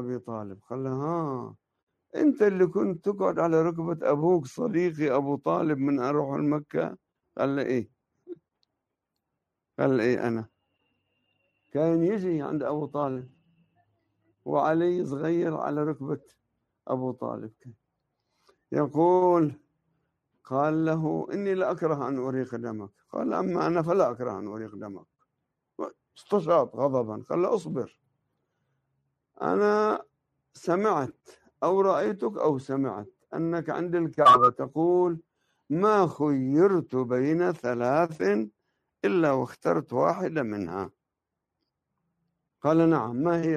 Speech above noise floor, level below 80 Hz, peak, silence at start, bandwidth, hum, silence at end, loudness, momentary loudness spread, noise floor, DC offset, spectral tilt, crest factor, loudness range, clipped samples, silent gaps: 60 dB; -68 dBFS; -8 dBFS; 0 s; 10 kHz; none; 0 s; -26 LUFS; 15 LU; -85 dBFS; under 0.1%; -8 dB/octave; 20 dB; 7 LU; under 0.1%; 1.83-1.87 s